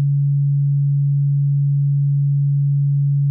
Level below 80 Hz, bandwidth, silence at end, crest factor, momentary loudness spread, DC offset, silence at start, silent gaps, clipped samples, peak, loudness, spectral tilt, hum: -72 dBFS; 0.2 kHz; 0 s; 4 dB; 0 LU; under 0.1%; 0 s; none; under 0.1%; -14 dBFS; -18 LUFS; -27 dB/octave; none